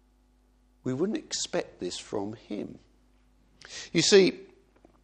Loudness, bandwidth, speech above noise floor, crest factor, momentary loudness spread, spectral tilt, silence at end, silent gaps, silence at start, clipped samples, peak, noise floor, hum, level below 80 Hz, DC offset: -27 LUFS; 9.8 kHz; 36 dB; 24 dB; 21 LU; -3.5 dB/octave; 0.6 s; none; 0.85 s; under 0.1%; -8 dBFS; -64 dBFS; none; -64 dBFS; under 0.1%